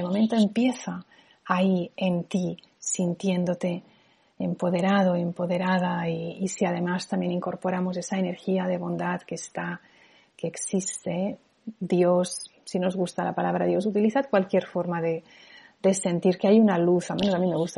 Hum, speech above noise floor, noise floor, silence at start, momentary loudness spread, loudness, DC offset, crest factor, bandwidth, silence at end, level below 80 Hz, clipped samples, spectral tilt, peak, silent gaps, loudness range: none; 31 dB; -56 dBFS; 0 s; 11 LU; -26 LUFS; under 0.1%; 20 dB; 11.5 kHz; 0 s; -66 dBFS; under 0.1%; -6 dB/octave; -6 dBFS; none; 6 LU